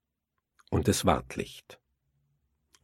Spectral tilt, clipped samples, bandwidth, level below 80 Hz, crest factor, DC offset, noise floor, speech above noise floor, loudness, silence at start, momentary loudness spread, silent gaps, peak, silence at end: -5 dB/octave; under 0.1%; 16.5 kHz; -50 dBFS; 26 dB; under 0.1%; -84 dBFS; 55 dB; -29 LUFS; 0.7 s; 15 LU; none; -6 dBFS; 1.1 s